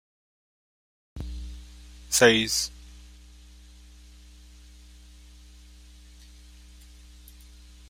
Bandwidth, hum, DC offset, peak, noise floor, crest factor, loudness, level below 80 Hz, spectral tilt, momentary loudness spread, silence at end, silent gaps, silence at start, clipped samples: 16 kHz; 60 Hz at -50 dBFS; under 0.1%; -2 dBFS; -50 dBFS; 30 dB; -23 LUFS; -46 dBFS; -2.5 dB/octave; 30 LU; 4.85 s; none; 1.15 s; under 0.1%